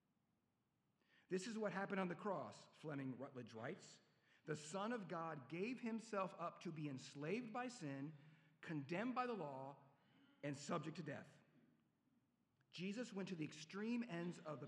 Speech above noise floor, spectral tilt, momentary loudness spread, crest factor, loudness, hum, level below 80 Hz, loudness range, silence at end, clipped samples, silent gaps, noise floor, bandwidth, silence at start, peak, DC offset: 38 dB; -5.5 dB/octave; 11 LU; 20 dB; -49 LUFS; none; under -90 dBFS; 4 LU; 0 s; under 0.1%; none; -87 dBFS; 11.5 kHz; 1.3 s; -30 dBFS; under 0.1%